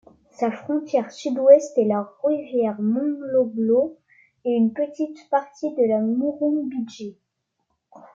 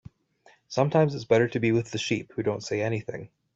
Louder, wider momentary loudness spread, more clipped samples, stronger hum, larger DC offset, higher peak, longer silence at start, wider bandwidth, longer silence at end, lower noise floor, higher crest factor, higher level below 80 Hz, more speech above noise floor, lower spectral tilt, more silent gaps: first, -22 LUFS vs -26 LUFS; about the same, 12 LU vs 10 LU; neither; neither; neither; first, -2 dBFS vs -8 dBFS; second, 0.4 s vs 0.7 s; about the same, 7.6 kHz vs 8 kHz; second, 0.15 s vs 0.3 s; first, -75 dBFS vs -61 dBFS; about the same, 20 dB vs 20 dB; second, -74 dBFS vs -64 dBFS; first, 54 dB vs 35 dB; about the same, -7 dB/octave vs -6 dB/octave; neither